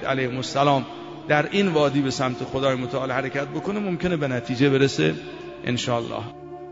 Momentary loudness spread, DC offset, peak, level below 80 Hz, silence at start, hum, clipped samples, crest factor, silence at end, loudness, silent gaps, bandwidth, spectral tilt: 13 LU; under 0.1%; -6 dBFS; -54 dBFS; 0 s; none; under 0.1%; 18 dB; 0 s; -23 LUFS; none; 8 kHz; -5.5 dB/octave